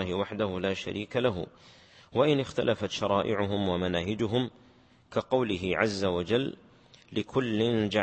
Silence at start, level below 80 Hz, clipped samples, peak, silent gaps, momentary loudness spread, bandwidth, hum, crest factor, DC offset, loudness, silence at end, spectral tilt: 0 s; -58 dBFS; under 0.1%; -10 dBFS; none; 8 LU; 8.8 kHz; none; 20 dB; under 0.1%; -29 LUFS; 0 s; -6 dB/octave